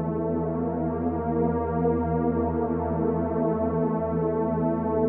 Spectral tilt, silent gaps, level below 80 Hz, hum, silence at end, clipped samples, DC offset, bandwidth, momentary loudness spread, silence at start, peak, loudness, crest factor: -11.5 dB/octave; none; -42 dBFS; none; 0 s; under 0.1%; under 0.1%; 3 kHz; 2 LU; 0 s; -12 dBFS; -26 LUFS; 14 dB